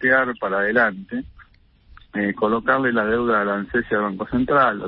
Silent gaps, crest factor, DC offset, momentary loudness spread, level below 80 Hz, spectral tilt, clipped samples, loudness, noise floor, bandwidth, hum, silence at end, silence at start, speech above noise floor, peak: none; 16 dB; under 0.1%; 8 LU; -48 dBFS; -10.5 dB/octave; under 0.1%; -20 LUFS; -53 dBFS; 5.4 kHz; none; 0 s; 0 s; 32 dB; -4 dBFS